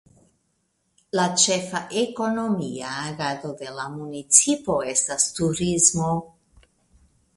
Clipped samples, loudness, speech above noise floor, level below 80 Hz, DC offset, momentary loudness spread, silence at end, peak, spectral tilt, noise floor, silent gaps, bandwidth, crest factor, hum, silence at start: under 0.1%; -22 LUFS; 48 dB; -56 dBFS; under 0.1%; 16 LU; 1.1 s; 0 dBFS; -3 dB/octave; -71 dBFS; none; 11.5 kHz; 24 dB; none; 1.15 s